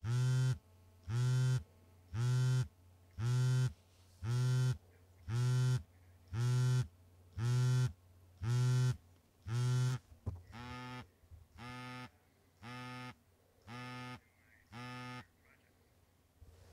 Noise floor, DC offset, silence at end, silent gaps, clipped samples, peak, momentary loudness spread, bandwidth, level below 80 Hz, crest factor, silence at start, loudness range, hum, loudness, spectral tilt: -71 dBFS; under 0.1%; 0.3 s; none; under 0.1%; -26 dBFS; 19 LU; 11.5 kHz; -64 dBFS; 12 dB; 0.05 s; 14 LU; none; -37 LUFS; -6 dB/octave